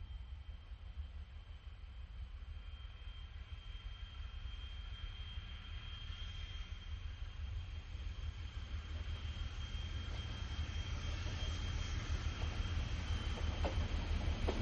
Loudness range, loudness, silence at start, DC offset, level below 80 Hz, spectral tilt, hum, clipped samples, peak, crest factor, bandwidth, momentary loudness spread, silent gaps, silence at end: 11 LU; -46 LUFS; 0 s; under 0.1%; -44 dBFS; -5 dB/octave; none; under 0.1%; -24 dBFS; 18 dB; 7.8 kHz; 12 LU; none; 0 s